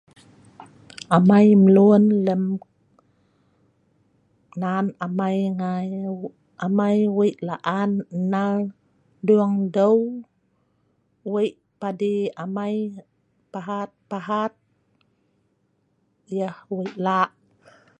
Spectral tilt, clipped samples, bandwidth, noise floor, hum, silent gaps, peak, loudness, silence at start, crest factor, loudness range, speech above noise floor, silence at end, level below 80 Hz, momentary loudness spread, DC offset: -8.5 dB/octave; under 0.1%; 9.4 kHz; -68 dBFS; none; none; -2 dBFS; -22 LUFS; 0.6 s; 20 dB; 12 LU; 48 dB; 0.7 s; -68 dBFS; 18 LU; under 0.1%